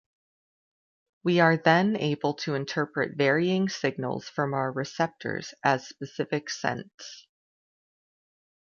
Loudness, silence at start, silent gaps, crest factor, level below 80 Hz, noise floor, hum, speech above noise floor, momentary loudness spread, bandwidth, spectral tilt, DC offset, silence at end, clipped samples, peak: -27 LUFS; 1.25 s; 6.94-6.98 s; 22 dB; -72 dBFS; under -90 dBFS; none; over 63 dB; 12 LU; 7.2 kHz; -5.5 dB/octave; under 0.1%; 1.55 s; under 0.1%; -6 dBFS